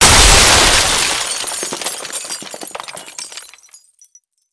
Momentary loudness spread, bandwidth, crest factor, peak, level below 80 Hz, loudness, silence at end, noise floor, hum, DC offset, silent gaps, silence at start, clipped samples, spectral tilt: 22 LU; 11 kHz; 14 dB; 0 dBFS; -24 dBFS; -11 LUFS; 1.1 s; -50 dBFS; none; under 0.1%; none; 0 s; under 0.1%; -1 dB/octave